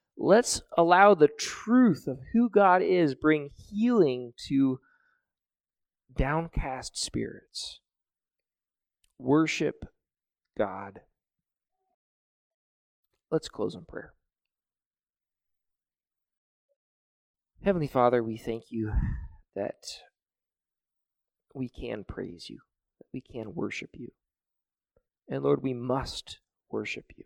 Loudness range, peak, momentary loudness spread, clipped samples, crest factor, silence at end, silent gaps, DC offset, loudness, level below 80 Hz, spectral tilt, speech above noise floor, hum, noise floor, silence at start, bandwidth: 17 LU; -6 dBFS; 20 LU; under 0.1%; 24 dB; 0.25 s; 11.94-13.03 s, 14.86-14.91 s, 16.38-16.69 s, 16.76-17.34 s; under 0.1%; -27 LUFS; -46 dBFS; -5.5 dB/octave; over 63 dB; none; under -90 dBFS; 0.15 s; 15.5 kHz